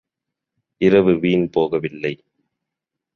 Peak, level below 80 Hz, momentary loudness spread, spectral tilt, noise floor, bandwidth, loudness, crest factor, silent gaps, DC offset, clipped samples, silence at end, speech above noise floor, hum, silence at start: -2 dBFS; -54 dBFS; 12 LU; -8.5 dB/octave; -83 dBFS; 6.6 kHz; -18 LUFS; 18 dB; none; under 0.1%; under 0.1%; 1 s; 66 dB; none; 0.8 s